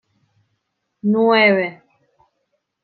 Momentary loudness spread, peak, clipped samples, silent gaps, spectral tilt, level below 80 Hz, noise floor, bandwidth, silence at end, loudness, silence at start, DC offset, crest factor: 13 LU; -2 dBFS; under 0.1%; none; -9 dB/octave; -76 dBFS; -73 dBFS; 4.7 kHz; 1.1 s; -16 LUFS; 1.05 s; under 0.1%; 18 dB